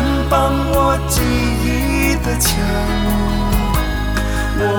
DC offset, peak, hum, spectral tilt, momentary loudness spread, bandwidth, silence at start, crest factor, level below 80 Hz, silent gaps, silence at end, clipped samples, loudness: under 0.1%; -2 dBFS; none; -5 dB/octave; 4 LU; over 20 kHz; 0 s; 14 dB; -20 dBFS; none; 0 s; under 0.1%; -17 LUFS